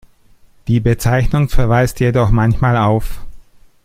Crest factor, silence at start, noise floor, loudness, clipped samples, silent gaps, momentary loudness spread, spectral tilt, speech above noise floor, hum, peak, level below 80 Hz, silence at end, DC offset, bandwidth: 14 dB; 0.65 s; -47 dBFS; -15 LUFS; under 0.1%; none; 5 LU; -7 dB/octave; 34 dB; none; 0 dBFS; -24 dBFS; 0.45 s; under 0.1%; 15.5 kHz